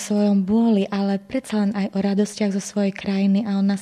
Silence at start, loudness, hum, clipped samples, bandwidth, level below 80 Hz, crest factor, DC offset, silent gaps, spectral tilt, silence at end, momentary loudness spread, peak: 0 s; -21 LUFS; none; under 0.1%; 11.5 kHz; -58 dBFS; 10 dB; under 0.1%; none; -6.5 dB/octave; 0 s; 5 LU; -10 dBFS